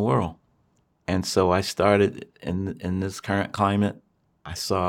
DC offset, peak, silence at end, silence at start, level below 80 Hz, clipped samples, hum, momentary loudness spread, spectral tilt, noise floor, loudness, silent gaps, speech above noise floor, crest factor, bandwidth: under 0.1%; -6 dBFS; 0 s; 0 s; -52 dBFS; under 0.1%; none; 13 LU; -5.5 dB/octave; -66 dBFS; -24 LUFS; none; 43 dB; 20 dB; 16.5 kHz